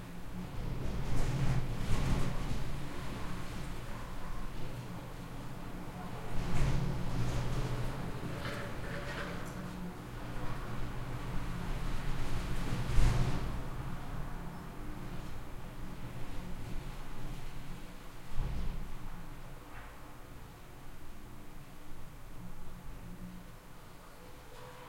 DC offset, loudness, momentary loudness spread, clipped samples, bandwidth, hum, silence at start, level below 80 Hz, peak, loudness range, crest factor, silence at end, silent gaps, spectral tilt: under 0.1%; -41 LUFS; 17 LU; under 0.1%; 16 kHz; none; 0 s; -40 dBFS; -12 dBFS; 13 LU; 22 dB; 0 s; none; -6 dB/octave